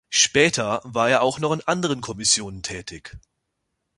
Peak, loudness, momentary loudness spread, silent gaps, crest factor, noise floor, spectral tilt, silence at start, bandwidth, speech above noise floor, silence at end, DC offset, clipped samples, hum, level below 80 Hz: -4 dBFS; -21 LUFS; 15 LU; none; 20 dB; -77 dBFS; -2.5 dB/octave; 0.1 s; 11.5 kHz; 55 dB; 0.8 s; under 0.1%; under 0.1%; none; -52 dBFS